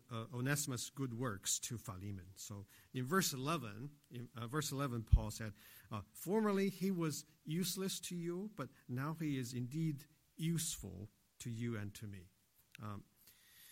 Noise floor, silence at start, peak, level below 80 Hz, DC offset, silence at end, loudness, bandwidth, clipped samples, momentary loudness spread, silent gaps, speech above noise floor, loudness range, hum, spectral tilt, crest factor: -67 dBFS; 0.1 s; -16 dBFS; -50 dBFS; under 0.1%; 0 s; -41 LUFS; 16 kHz; under 0.1%; 16 LU; none; 26 dB; 5 LU; none; -4.5 dB/octave; 26 dB